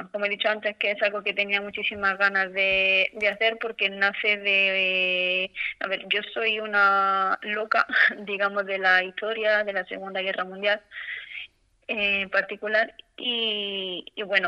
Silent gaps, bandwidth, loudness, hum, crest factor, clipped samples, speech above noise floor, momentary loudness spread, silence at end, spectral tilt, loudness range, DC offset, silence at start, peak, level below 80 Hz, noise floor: none; 8.4 kHz; -24 LUFS; none; 20 dB; under 0.1%; 21 dB; 10 LU; 0 s; -4 dB/octave; 5 LU; under 0.1%; 0 s; -4 dBFS; -66 dBFS; -46 dBFS